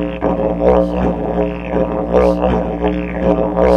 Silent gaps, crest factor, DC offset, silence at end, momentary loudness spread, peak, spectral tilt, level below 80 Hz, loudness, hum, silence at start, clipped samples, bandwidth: none; 14 dB; under 0.1%; 0 s; 5 LU; 0 dBFS; -9 dB/octave; -26 dBFS; -16 LUFS; none; 0 s; under 0.1%; 7 kHz